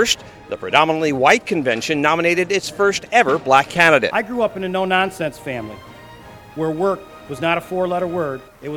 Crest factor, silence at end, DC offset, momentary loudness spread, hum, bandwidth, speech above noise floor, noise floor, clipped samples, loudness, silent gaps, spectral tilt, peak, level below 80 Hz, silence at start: 18 dB; 0 s; under 0.1%; 14 LU; none; 18 kHz; 22 dB; -40 dBFS; under 0.1%; -18 LUFS; none; -4 dB/octave; 0 dBFS; -52 dBFS; 0 s